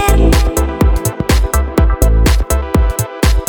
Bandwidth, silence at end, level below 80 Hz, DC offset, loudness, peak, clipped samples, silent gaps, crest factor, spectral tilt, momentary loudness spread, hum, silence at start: 20 kHz; 0 s; -12 dBFS; under 0.1%; -13 LUFS; 0 dBFS; under 0.1%; none; 10 dB; -5.5 dB/octave; 4 LU; none; 0 s